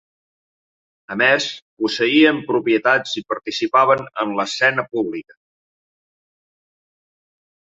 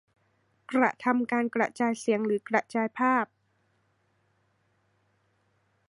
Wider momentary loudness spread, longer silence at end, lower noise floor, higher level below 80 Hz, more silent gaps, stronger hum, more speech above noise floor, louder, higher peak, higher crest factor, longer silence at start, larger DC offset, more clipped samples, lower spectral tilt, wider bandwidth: first, 10 LU vs 4 LU; about the same, 2.55 s vs 2.65 s; first, under -90 dBFS vs -71 dBFS; first, -66 dBFS vs -82 dBFS; first, 1.62-1.77 s vs none; neither; first, over 72 dB vs 44 dB; first, -18 LUFS vs -27 LUFS; first, -2 dBFS vs -8 dBFS; about the same, 20 dB vs 22 dB; first, 1.1 s vs 0.7 s; neither; neither; second, -4 dB/octave vs -5.5 dB/octave; second, 7.8 kHz vs 11.5 kHz